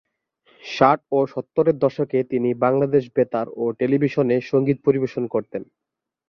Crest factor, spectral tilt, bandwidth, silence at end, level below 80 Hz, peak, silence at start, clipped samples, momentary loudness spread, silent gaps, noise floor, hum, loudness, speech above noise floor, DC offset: 20 dB; -8 dB/octave; 6.6 kHz; 0.65 s; -62 dBFS; -2 dBFS; 0.65 s; under 0.1%; 8 LU; none; -62 dBFS; none; -21 LUFS; 41 dB; under 0.1%